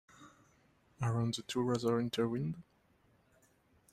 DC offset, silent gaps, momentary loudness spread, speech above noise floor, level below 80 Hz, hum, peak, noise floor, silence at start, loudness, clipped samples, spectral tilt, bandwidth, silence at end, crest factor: under 0.1%; none; 7 LU; 36 dB; -68 dBFS; none; -22 dBFS; -71 dBFS; 0.2 s; -36 LUFS; under 0.1%; -6 dB/octave; 13.5 kHz; 1.3 s; 18 dB